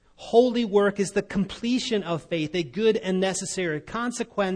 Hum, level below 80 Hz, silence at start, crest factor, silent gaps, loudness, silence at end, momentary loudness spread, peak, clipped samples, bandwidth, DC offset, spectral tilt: none; -56 dBFS; 0.2 s; 18 dB; none; -25 LUFS; 0 s; 8 LU; -8 dBFS; under 0.1%; 10.5 kHz; under 0.1%; -4.5 dB/octave